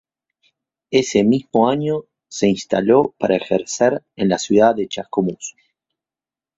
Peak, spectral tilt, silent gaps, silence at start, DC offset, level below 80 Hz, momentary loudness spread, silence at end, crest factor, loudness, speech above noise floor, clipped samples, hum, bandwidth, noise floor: -2 dBFS; -5 dB/octave; none; 0.9 s; under 0.1%; -56 dBFS; 9 LU; 1.1 s; 18 dB; -18 LUFS; over 73 dB; under 0.1%; none; 8 kHz; under -90 dBFS